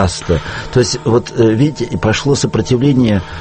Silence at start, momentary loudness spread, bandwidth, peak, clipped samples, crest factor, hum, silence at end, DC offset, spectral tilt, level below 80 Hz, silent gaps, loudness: 0 s; 5 LU; 8.8 kHz; 0 dBFS; under 0.1%; 14 dB; none; 0 s; under 0.1%; -6 dB/octave; -32 dBFS; none; -14 LUFS